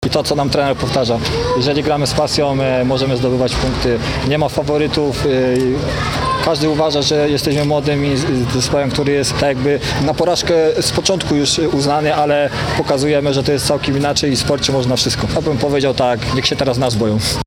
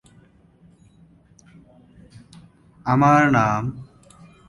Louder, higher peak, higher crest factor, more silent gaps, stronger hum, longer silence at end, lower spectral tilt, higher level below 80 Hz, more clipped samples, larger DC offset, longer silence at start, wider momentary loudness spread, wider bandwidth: first, -15 LUFS vs -19 LUFS; first, 0 dBFS vs -4 dBFS; second, 14 dB vs 20 dB; neither; neither; second, 0 s vs 0.65 s; second, -5 dB/octave vs -7 dB/octave; first, -32 dBFS vs -54 dBFS; neither; neither; second, 0 s vs 2.85 s; second, 2 LU vs 17 LU; first, 17.5 kHz vs 11.5 kHz